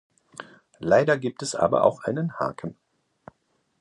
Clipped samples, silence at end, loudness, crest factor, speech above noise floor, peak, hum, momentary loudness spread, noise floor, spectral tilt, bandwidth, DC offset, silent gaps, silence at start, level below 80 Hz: under 0.1%; 1.1 s; -24 LUFS; 22 dB; 47 dB; -4 dBFS; none; 23 LU; -70 dBFS; -5.5 dB/octave; 11.5 kHz; under 0.1%; none; 0.4 s; -62 dBFS